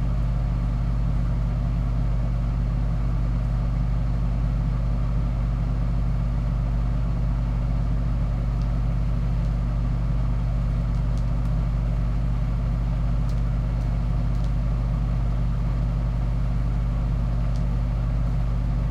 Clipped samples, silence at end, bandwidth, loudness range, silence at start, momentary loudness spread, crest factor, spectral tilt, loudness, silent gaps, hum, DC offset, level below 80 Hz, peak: under 0.1%; 0 s; 5.2 kHz; 0 LU; 0 s; 0 LU; 10 dB; -9 dB/octave; -26 LUFS; none; none; under 0.1%; -24 dBFS; -12 dBFS